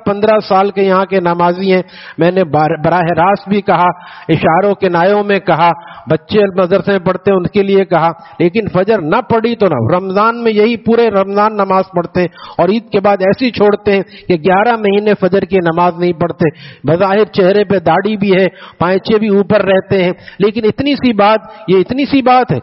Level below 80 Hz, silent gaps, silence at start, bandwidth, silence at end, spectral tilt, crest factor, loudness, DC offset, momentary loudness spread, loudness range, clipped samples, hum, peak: -46 dBFS; none; 0.05 s; 5.8 kHz; 0 s; -5 dB/octave; 12 dB; -12 LUFS; under 0.1%; 5 LU; 1 LU; under 0.1%; none; 0 dBFS